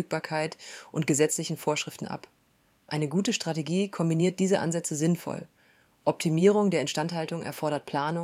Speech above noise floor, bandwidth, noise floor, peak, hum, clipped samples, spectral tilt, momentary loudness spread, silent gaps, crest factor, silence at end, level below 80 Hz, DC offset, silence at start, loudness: 39 dB; 15.5 kHz; -66 dBFS; -10 dBFS; none; under 0.1%; -5 dB/octave; 11 LU; none; 20 dB; 0 s; -72 dBFS; under 0.1%; 0 s; -28 LUFS